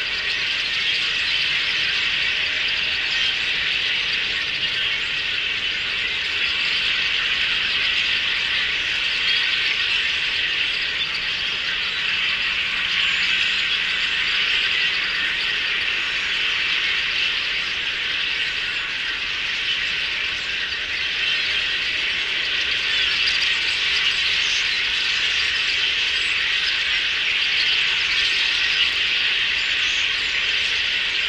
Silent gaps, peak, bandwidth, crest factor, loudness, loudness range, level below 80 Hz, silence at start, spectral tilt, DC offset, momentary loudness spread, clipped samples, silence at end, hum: none; -6 dBFS; 15 kHz; 16 dB; -19 LUFS; 3 LU; -50 dBFS; 0 s; 0 dB/octave; under 0.1%; 4 LU; under 0.1%; 0 s; none